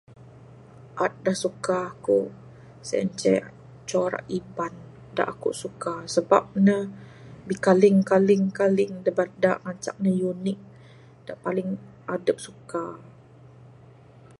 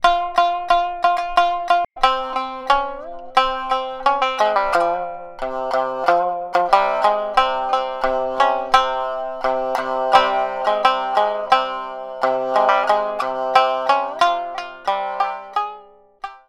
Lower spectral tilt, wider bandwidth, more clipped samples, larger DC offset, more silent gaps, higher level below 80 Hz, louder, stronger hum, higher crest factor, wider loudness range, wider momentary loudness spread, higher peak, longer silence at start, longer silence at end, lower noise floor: first, -6 dB/octave vs -2.5 dB/octave; second, 11.5 kHz vs 13.5 kHz; neither; neither; neither; second, -64 dBFS vs -46 dBFS; second, -25 LUFS vs -19 LUFS; neither; about the same, 22 dB vs 20 dB; first, 9 LU vs 2 LU; first, 18 LU vs 9 LU; second, -4 dBFS vs 0 dBFS; first, 0.85 s vs 0 s; first, 1.35 s vs 0.1 s; first, -50 dBFS vs -44 dBFS